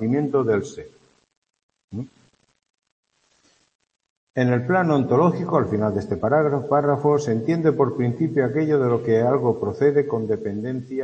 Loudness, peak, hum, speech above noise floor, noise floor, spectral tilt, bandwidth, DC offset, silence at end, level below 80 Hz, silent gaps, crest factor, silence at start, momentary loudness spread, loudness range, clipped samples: -21 LUFS; -4 dBFS; none; 43 dB; -63 dBFS; -8.5 dB/octave; 8.2 kHz; under 0.1%; 0 s; -60 dBFS; 1.37-1.42 s, 1.63-1.69 s, 1.84-1.88 s, 2.70-2.74 s, 2.92-3.03 s, 3.75-3.79 s, 4.10-4.27 s; 18 dB; 0 s; 10 LU; 9 LU; under 0.1%